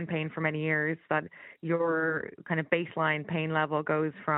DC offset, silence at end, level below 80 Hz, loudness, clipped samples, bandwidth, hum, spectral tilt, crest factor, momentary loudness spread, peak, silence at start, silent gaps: under 0.1%; 0 s; -74 dBFS; -30 LUFS; under 0.1%; 4 kHz; none; -5 dB/octave; 20 dB; 5 LU; -10 dBFS; 0 s; none